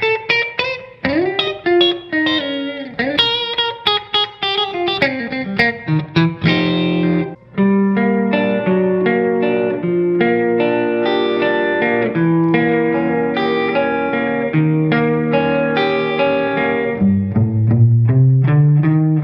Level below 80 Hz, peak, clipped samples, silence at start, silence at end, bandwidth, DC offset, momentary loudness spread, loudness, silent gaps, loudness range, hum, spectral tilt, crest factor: -50 dBFS; 0 dBFS; under 0.1%; 0 s; 0 s; 6.2 kHz; under 0.1%; 5 LU; -16 LUFS; none; 2 LU; none; -8 dB/octave; 16 dB